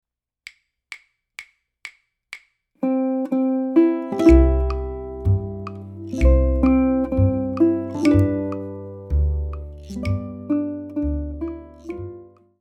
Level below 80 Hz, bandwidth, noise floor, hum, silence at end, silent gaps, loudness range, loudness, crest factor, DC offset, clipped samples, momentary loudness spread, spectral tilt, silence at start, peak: -26 dBFS; 8.8 kHz; -47 dBFS; none; 0.35 s; none; 8 LU; -21 LUFS; 20 dB; under 0.1%; under 0.1%; 23 LU; -9 dB/octave; 0.9 s; -2 dBFS